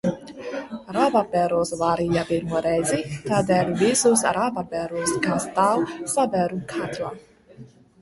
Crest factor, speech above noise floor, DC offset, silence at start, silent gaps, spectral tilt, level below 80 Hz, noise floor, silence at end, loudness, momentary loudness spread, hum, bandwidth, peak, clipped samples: 18 dB; 25 dB; under 0.1%; 0.05 s; none; -4.5 dB/octave; -54 dBFS; -47 dBFS; 0.35 s; -23 LUFS; 11 LU; none; 12 kHz; -6 dBFS; under 0.1%